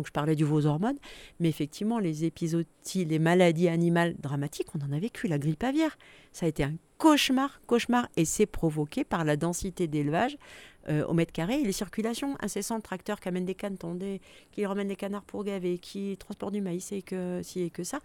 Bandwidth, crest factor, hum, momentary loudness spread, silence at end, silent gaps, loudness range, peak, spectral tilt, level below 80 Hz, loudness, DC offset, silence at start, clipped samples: 17.5 kHz; 22 dB; none; 11 LU; 0.05 s; none; 7 LU; -8 dBFS; -5.5 dB/octave; -54 dBFS; -29 LUFS; under 0.1%; 0 s; under 0.1%